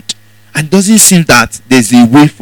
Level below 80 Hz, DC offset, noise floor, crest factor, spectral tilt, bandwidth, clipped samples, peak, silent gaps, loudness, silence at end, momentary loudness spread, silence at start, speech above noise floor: -38 dBFS; 0.7%; -25 dBFS; 8 dB; -4 dB/octave; over 20 kHz; 5%; 0 dBFS; none; -5 LUFS; 0.1 s; 15 LU; 0.1 s; 20 dB